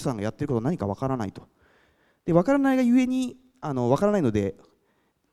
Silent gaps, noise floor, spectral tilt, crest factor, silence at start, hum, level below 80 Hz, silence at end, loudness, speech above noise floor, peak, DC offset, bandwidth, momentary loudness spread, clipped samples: none; -69 dBFS; -7.5 dB/octave; 20 dB; 0 s; none; -54 dBFS; 0.8 s; -25 LUFS; 45 dB; -6 dBFS; under 0.1%; 13 kHz; 12 LU; under 0.1%